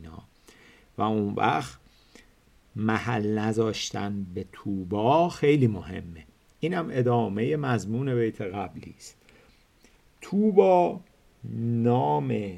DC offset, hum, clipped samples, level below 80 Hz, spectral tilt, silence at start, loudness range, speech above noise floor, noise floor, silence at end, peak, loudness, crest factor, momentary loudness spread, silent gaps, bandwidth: under 0.1%; none; under 0.1%; -60 dBFS; -7 dB/octave; 0 s; 4 LU; 34 dB; -59 dBFS; 0 s; -4 dBFS; -26 LUFS; 22 dB; 19 LU; none; 12.5 kHz